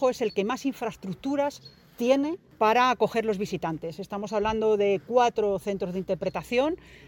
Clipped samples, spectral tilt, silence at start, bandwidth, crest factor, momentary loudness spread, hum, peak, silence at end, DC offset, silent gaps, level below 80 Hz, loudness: under 0.1%; -5.5 dB/octave; 0 s; 17 kHz; 18 dB; 10 LU; none; -10 dBFS; 0.1 s; under 0.1%; none; -56 dBFS; -27 LUFS